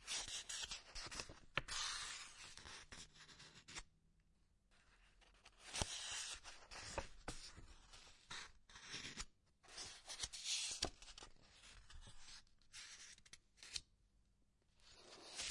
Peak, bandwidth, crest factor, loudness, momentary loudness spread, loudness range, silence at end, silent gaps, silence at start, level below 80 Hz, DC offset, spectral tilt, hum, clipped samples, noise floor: -20 dBFS; 11.5 kHz; 32 dB; -49 LUFS; 18 LU; 9 LU; 0 s; none; 0 s; -64 dBFS; under 0.1%; -0.5 dB/octave; none; under 0.1%; -78 dBFS